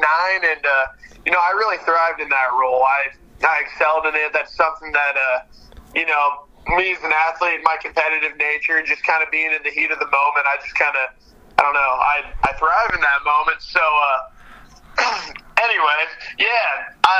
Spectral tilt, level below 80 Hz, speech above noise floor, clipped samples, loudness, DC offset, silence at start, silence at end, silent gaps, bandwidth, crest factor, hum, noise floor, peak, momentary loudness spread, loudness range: -2.5 dB/octave; -44 dBFS; 24 dB; under 0.1%; -18 LUFS; under 0.1%; 0 s; 0 s; none; 12 kHz; 18 dB; none; -43 dBFS; 0 dBFS; 5 LU; 2 LU